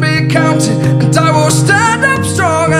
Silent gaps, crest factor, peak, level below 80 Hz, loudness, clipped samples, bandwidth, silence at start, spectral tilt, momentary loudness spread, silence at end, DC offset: none; 10 dB; 0 dBFS; -42 dBFS; -10 LUFS; under 0.1%; 15 kHz; 0 s; -5 dB/octave; 3 LU; 0 s; under 0.1%